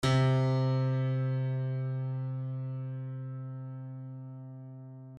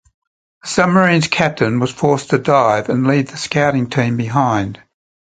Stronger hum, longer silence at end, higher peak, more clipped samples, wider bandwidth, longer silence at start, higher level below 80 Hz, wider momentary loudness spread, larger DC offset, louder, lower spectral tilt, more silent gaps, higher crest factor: neither; second, 0 s vs 0.65 s; second, -16 dBFS vs 0 dBFS; neither; about the same, 9.6 kHz vs 9.4 kHz; second, 0 s vs 0.65 s; second, -60 dBFS vs -50 dBFS; first, 18 LU vs 6 LU; neither; second, -32 LUFS vs -15 LUFS; first, -7.5 dB/octave vs -5.5 dB/octave; neither; about the same, 16 dB vs 16 dB